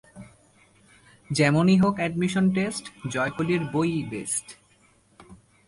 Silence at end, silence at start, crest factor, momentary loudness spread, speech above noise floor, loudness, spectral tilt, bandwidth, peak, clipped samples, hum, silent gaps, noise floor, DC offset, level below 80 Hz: 0.3 s; 0.15 s; 18 dB; 10 LU; 37 dB; -24 LUFS; -5.5 dB/octave; 11.5 kHz; -8 dBFS; under 0.1%; none; none; -61 dBFS; under 0.1%; -58 dBFS